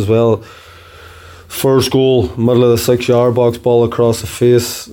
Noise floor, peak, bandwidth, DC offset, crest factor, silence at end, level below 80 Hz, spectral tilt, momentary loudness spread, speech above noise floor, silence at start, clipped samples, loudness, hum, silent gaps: -37 dBFS; -2 dBFS; 17 kHz; under 0.1%; 12 dB; 0 s; -42 dBFS; -6 dB/octave; 4 LU; 25 dB; 0 s; under 0.1%; -13 LUFS; none; none